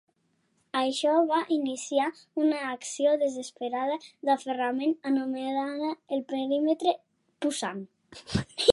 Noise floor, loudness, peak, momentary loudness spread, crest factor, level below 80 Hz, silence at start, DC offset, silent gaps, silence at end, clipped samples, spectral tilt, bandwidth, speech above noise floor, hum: -72 dBFS; -29 LUFS; -4 dBFS; 9 LU; 24 dB; -58 dBFS; 0.75 s; under 0.1%; none; 0 s; under 0.1%; -4.5 dB/octave; 11.5 kHz; 44 dB; none